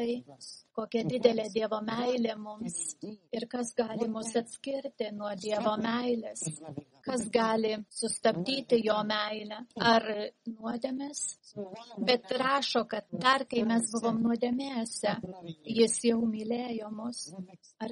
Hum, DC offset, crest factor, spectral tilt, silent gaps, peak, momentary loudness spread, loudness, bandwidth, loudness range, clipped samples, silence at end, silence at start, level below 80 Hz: none; under 0.1%; 22 dB; -3.5 dB/octave; none; -8 dBFS; 14 LU; -31 LUFS; 11.5 kHz; 5 LU; under 0.1%; 0 s; 0 s; -72 dBFS